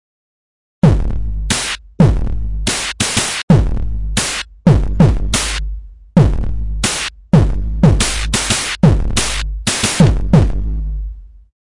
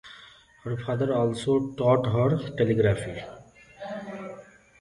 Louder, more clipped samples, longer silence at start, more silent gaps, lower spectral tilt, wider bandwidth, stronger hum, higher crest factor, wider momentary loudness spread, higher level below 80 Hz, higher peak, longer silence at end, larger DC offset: first, -15 LUFS vs -26 LUFS; neither; first, 0.85 s vs 0.05 s; first, 3.43-3.48 s vs none; second, -4.5 dB/octave vs -7.5 dB/octave; about the same, 11.5 kHz vs 11 kHz; neither; about the same, 14 dB vs 18 dB; second, 10 LU vs 20 LU; first, -20 dBFS vs -54 dBFS; first, 0 dBFS vs -8 dBFS; about the same, 0.35 s vs 0.35 s; neither